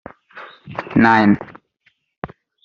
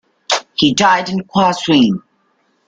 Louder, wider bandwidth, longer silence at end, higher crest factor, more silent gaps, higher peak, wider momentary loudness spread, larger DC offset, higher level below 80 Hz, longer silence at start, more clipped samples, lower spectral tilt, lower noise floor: about the same, -15 LUFS vs -14 LUFS; second, 7 kHz vs 9.4 kHz; second, 0.4 s vs 0.7 s; about the same, 18 dB vs 16 dB; first, 2.18-2.22 s vs none; about the same, -2 dBFS vs 0 dBFS; first, 26 LU vs 7 LU; neither; about the same, -52 dBFS vs -52 dBFS; about the same, 0.35 s vs 0.3 s; neither; about the same, -5 dB/octave vs -4 dB/octave; about the same, -62 dBFS vs -61 dBFS